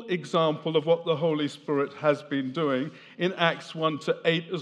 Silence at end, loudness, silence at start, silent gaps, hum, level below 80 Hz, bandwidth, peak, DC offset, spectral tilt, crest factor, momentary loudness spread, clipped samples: 0 s; -27 LUFS; 0 s; none; none; -86 dBFS; 10.5 kHz; -6 dBFS; under 0.1%; -6 dB/octave; 22 dB; 6 LU; under 0.1%